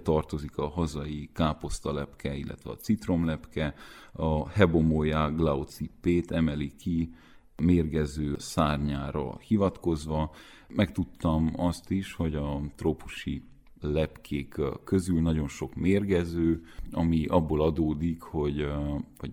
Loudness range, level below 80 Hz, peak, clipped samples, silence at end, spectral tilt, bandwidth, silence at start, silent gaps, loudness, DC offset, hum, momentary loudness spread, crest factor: 4 LU; -42 dBFS; -8 dBFS; under 0.1%; 0 s; -7 dB/octave; 15.5 kHz; 0 s; none; -29 LUFS; under 0.1%; none; 10 LU; 20 dB